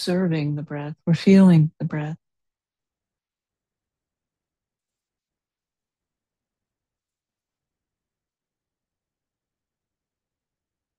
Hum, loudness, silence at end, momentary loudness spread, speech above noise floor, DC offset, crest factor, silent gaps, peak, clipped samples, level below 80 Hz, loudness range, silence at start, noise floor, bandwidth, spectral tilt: none; -19 LUFS; 8.85 s; 18 LU; over 71 dB; under 0.1%; 22 dB; none; -4 dBFS; under 0.1%; -66 dBFS; 16 LU; 0 s; under -90 dBFS; 10 kHz; -8 dB/octave